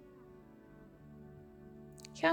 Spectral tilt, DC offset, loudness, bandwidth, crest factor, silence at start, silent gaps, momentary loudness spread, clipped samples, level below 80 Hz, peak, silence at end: -4.5 dB/octave; under 0.1%; -45 LUFS; 18.5 kHz; 24 dB; 0 s; none; 7 LU; under 0.1%; -68 dBFS; -18 dBFS; 0 s